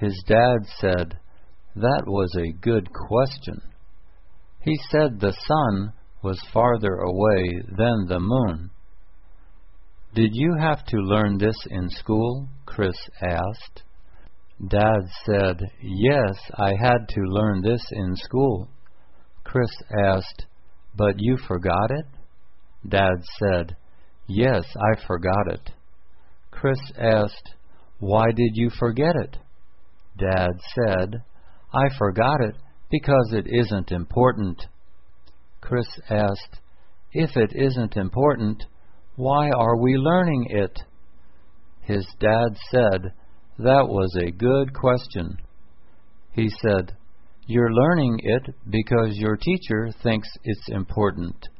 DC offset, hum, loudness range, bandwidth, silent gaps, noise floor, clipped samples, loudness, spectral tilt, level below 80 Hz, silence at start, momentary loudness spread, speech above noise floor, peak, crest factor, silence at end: 1%; none; 4 LU; 5.8 kHz; none; -53 dBFS; under 0.1%; -22 LUFS; -11.5 dB/octave; -42 dBFS; 0 s; 11 LU; 31 dB; -4 dBFS; 20 dB; 0.05 s